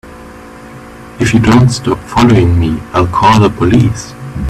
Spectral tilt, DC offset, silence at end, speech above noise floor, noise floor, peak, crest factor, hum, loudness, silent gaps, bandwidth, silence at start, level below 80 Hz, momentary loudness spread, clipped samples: -6.5 dB/octave; under 0.1%; 0 s; 22 dB; -31 dBFS; 0 dBFS; 10 dB; none; -10 LUFS; none; 13.5 kHz; 0.05 s; -28 dBFS; 16 LU; under 0.1%